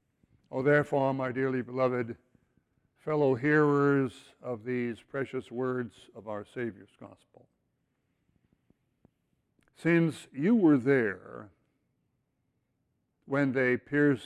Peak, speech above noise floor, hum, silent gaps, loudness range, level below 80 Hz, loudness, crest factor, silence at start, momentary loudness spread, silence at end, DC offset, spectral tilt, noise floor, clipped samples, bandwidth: -12 dBFS; 49 dB; none; none; 11 LU; -70 dBFS; -29 LUFS; 18 dB; 0.5 s; 16 LU; 0 s; under 0.1%; -8 dB/octave; -78 dBFS; under 0.1%; 11 kHz